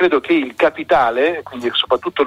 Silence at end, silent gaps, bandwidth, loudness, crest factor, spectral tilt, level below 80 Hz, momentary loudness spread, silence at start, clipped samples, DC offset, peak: 0 s; none; 11.5 kHz; -17 LUFS; 14 dB; -5 dB/octave; -52 dBFS; 5 LU; 0 s; under 0.1%; under 0.1%; -2 dBFS